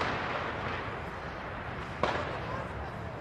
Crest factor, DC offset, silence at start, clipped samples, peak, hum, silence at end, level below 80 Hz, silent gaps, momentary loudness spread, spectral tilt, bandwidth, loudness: 22 dB; under 0.1%; 0 s; under 0.1%; -12 dBFS; none; 0 s; -50 dBFS; none; 7 LU; -6 dB/octave; 13 kHz; -36 LUFS